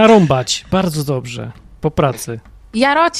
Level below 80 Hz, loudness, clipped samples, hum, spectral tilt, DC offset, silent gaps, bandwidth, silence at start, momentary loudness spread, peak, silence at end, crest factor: -40 dBFS; -16 LUFS; under 0.1%; none; -5 dB/octave; under 0.1%; none; 15.5 kHz; 0 s; 16 LU; 0 dBFS; 0 s; 16 dB